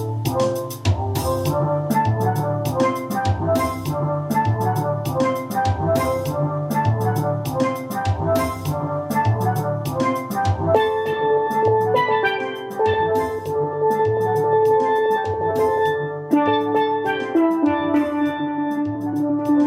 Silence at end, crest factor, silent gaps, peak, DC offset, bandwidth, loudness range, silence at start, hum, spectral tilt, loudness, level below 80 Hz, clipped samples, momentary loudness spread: 0 s; 16 dB; none; -2 dBFS; under 0.1%; 16.5 kHz; 2 LU; 0 s; none; -7 dB/octave; -21 LUFS; -48 dBFS; under 0.1%; 5 LU